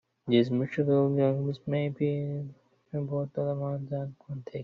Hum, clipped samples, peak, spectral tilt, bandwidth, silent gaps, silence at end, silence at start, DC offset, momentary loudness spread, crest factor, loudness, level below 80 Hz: none; under 0.1%; -10 dBFS; -7.5 dB/octave; 5.6 kHz; none; 0 s; 0.25 s; under 0.1%; 14 LU; 18 dB; -29 LUFS; -68 dBFS